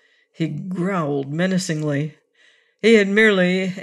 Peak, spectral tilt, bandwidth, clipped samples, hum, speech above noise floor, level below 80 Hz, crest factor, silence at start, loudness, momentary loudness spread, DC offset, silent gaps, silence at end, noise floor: -4 dBFS; -5.5 dB/octave; 12 kHz; under 0.1%; none; 39 dB; -68 dBFS; 16 dB; 0.4 s; -19 LUFS; 12 LU; under 0.1%; none; 0 s; -57 dBFS